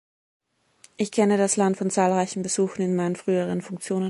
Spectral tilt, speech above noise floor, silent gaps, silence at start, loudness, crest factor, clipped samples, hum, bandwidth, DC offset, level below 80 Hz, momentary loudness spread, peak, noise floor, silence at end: -5 dB/octave; 34 dB; none; 1 s; -24 LUFS; 18 dB; under 0.1%; none; 11.5 kHz; under 0.1%; -68 dBFS; 8 LU; -8 dBFS; -58 dBFS; 0 s